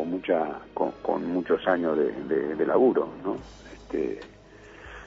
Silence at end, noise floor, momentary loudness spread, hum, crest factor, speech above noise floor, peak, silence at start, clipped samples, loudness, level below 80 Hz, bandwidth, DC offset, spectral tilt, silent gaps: 0 s; -48 dBFS; 20 LU; none; 18 dB; 22 dB; -10 dBFS; 0 s; under 0.1%; -27 LUFS; -56 dBFS; 7.6 kHz; under 0.1%; -7.5 dB/octave; none